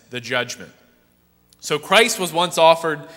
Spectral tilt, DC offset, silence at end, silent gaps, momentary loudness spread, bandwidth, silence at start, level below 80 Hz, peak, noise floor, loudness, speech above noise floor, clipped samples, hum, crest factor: -2.5 dB/octave; under 0.1%; 0 s; none; 14 LU; 16 kHz; 0.1 s; -64 dBFS; 0 dBFS; -59 dBFS; -18 LUFS; 40 dB; under 0.1%; 60 Hz at -50 dBFS; 20 dB